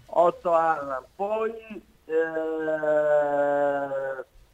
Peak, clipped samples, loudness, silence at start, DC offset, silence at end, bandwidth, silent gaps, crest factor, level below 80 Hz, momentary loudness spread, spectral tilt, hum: -8 dBFS; under 0.1%; -25 LUFS; 0.1 s; under 0.1%; 0.3 s; 9 kHz; none; 18 dB; -62 dBFS; 12 LU; -6.5 dB/octave; none